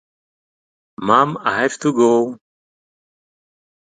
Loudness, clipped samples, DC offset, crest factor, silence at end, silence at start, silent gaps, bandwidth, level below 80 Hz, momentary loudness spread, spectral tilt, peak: -17 LUFS; under 0.1%; under 0.1%; 20 dB; 1.5 s; 1 s; none; 9.4 kHz; -62 dBFS; 7 LU; -5 dB/octave; 0 dBFS